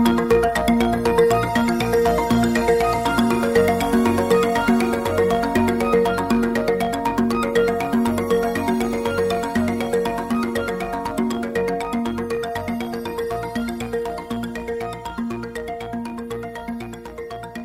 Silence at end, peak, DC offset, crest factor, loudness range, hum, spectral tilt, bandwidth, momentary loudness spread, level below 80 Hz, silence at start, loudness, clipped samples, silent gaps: 0 s; -2 dBFS; under 0.1%; 18 dB; 9 LU; none; -5.5 dB/octave; 16 kHz; 11 LU; -40 dBFS; 0 s; -21 LUFS; under 0.1%; none